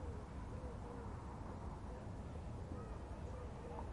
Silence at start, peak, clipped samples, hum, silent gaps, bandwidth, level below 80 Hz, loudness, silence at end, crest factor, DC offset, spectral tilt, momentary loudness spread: 0 s; -36 dBFS; under 0.1%; none; none; 11 kHz; -52 dBFS; -50 LUFS; 0 s; 12 dB; under 0.1%; -7.5 dB/octave; 1 LU